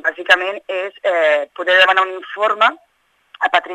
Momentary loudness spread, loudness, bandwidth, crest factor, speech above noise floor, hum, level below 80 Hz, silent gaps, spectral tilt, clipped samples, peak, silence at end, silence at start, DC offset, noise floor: 10 LU; -15 LUFS; 12.5 kHz; 16 dB; 32 dB; none; -72 dBFS; none; -1 dB/octave; under 0.1%; 0 dBFS; 0 s; 0.05 s; under 0.1%; -48 dBFS